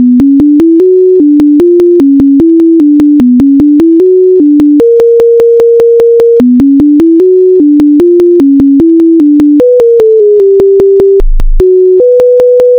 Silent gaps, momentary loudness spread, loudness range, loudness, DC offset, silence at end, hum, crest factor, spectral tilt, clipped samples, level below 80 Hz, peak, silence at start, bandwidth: none; 0 LU; 1 LU; -4 LUFS; under 0.1%; 0 s; none; 2 dB; -9 dB/octave; 6%; -18 dBFS; 0 dBFS; 0 s; 5.4 kHz